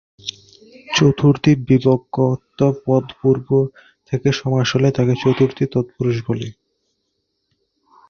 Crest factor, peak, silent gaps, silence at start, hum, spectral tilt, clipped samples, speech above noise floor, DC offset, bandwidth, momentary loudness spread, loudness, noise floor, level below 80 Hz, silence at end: 16 dB; -2 dBFS; none; 0.25 s; none; -6.5 dB/octave; under 0.1%; 55 dB; under 0.1%; 7 kHz; 11 LU; -18 LUFS; -72 dBFS; -50 dBFS; 1.6 s